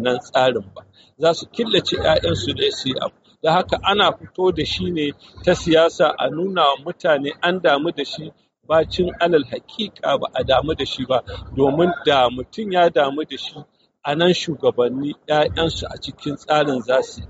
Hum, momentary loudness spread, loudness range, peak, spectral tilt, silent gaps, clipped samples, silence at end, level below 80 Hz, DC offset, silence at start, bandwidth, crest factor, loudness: none; 11 LU; 2 LU; -2 dBFS; -3 dB/octave; none; under 0.1%; 0.05 s; -44 dBFS; under 0.1%; 0 s; 8 kHz; 16 dB; -19 LUFS